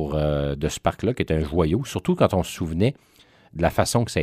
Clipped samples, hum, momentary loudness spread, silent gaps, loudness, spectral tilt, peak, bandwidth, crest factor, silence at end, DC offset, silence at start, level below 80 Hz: under 0.1%; none; 5 LU; none; -23 LUFS; -6 dB/octave; -4 dBFS; 15.5 kHz; 20 dB; 0 s; under 0.1%; 0 s; -38 dBFS